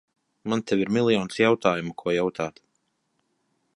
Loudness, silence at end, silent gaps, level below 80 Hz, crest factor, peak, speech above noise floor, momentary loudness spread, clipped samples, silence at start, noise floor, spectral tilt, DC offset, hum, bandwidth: -24 LUFS; 1.3 s; none; -62 dBFS; 22 dB; -4 dBFS; 50 dB; 11 LU; under 0.1%; 0.45 s; -74 dBFS; -5.5 dB/octave; under 0.1%; none; 11.5 kHz